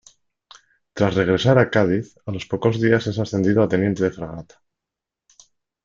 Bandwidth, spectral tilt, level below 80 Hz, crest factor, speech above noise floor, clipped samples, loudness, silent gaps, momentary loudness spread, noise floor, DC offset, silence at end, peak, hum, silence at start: 7.6 kHz; -7 dB/octave; -54 dBFS; 20 dB; 67 dB; under 0.1%; -20 LUFS; none; 15 LU; -86 dBFS; under 0.1%; 1.4 s; -2 dBFS; none; 0.95 s